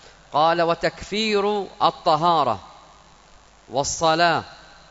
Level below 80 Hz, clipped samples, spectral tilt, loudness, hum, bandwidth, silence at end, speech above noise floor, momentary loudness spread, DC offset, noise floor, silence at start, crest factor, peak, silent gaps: -52 dBFS; under 0.1%; -3.5 dB/octave; -21 LUFS; none; 8 kHz; 0.35 s; 30 dB; 8 LU; under 0.1%; -51 dBFS; 0.3 s; 20 dB; -4 dBFS; none